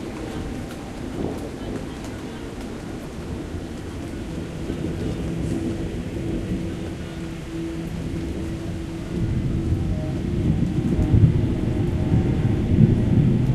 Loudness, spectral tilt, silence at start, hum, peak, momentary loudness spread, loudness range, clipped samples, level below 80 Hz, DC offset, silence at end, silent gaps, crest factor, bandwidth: -25 LUFS; -8 dB/octave; 0 s; none; -2 dBFS; 14 LU; 11 LU; under 0.1%; -32 dBFS; under 0.1%; 0 s; none; 22 dB; 13 kHz